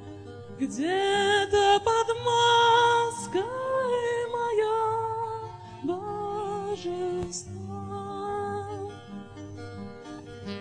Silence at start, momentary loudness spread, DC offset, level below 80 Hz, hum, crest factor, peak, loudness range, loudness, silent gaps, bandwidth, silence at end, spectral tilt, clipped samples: 0 s; 20 LU; under 0.1%; -58 dBFS; none; 16 dB; -10 dBFS; 12 LU; -26 LUFS; none; 10.5 kHz; 0 s; -3.5 dB/octave; under 0.1%